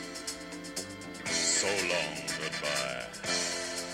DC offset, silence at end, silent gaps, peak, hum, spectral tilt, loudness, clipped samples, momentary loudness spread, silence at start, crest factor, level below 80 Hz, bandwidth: under 0.1%; 0 s; none; -16 dBFS; none; -1 dB/octave; -31 LUFS; under 0.1%; 12 LU; 0 s; 18 dB; -62 dBFS; 16 kHz